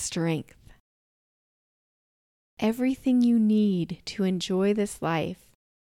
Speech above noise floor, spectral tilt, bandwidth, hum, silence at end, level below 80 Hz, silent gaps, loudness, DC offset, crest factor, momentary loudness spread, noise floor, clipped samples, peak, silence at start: over 65 dB; -6 dB/octave; 15 kHz; none; 0.6 s; -60 dBFS; 0.80-2.57 s; -26 LUFS; under 0.1%; 16 dB; 10 LU; under -90 dBFS; under 0.1%; -12 dBFS; 0 s